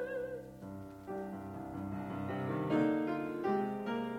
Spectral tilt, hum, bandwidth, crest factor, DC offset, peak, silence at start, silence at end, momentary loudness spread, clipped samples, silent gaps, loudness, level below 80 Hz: -8 dB/octave; none; 16 kHz; 18 dB; under 0.1%; -20 dBFS; 0 s; 0 s; 14 LU; under 0.1%; none; -37 LUFS; -66 dBFS